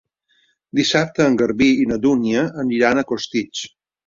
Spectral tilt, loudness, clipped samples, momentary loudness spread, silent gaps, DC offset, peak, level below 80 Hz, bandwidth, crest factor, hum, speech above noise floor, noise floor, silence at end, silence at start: -5 dB/octave; -18 LUFS; under 0.1%; 8 LU; none; under 0.1%; -2 dBFS; -52 dBFS; 7.6 kHz; 18 dB; none; 45 dB; -63 dBFS; 0.4 s; 0.75 s